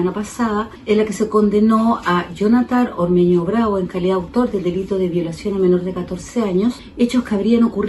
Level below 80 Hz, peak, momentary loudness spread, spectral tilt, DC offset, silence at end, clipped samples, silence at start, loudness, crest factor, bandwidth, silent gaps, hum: -44 dBFS; -2 dBFS; 7 LU; -7 dB/octave; under 0.1%; 0 s; under 0.1%; 0 s; -18 LUFS; 14 dB; 12 kHz; none; none